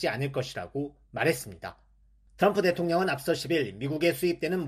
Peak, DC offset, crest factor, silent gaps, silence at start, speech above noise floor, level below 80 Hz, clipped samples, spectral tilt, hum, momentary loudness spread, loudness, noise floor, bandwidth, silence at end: -10 dBFS; under 0.1%; 18 dB; none; 0 s; 33 dB; -60 dBFS; under 0.1%; -5.5 dB/octave; none; 11 LU; -28 LUFS; -61 dBFS; 14.5 kHz; 0 s